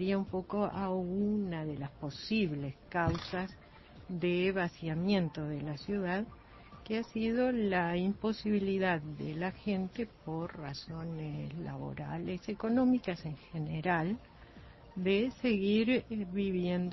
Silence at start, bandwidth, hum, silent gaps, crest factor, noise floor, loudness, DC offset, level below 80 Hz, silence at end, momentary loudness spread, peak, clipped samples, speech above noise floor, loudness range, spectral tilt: 0 s; 6 kHz; none; none; 18 dB; -54 dBFS; -34 LUFS; under 0.1%; -58 dBFS; 0 s; 11 LU; -16 dBFS; under 0.1%; 20 dB; 3 LU; -5.5 dB/octave